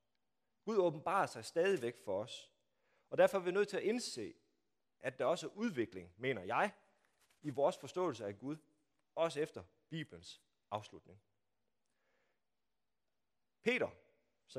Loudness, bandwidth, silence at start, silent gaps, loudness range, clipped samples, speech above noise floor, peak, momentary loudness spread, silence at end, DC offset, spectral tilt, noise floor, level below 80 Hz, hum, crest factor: -39 LUFS; 14.5 kHz; 0.65 s; none; 14 LU; under 0.1%; over 52 dB; -18 dBFS; 14 LU; 0 s; under 0.1%; -5 dB/octave; under -90 dBFS; -84 dBFS; none; 24 dB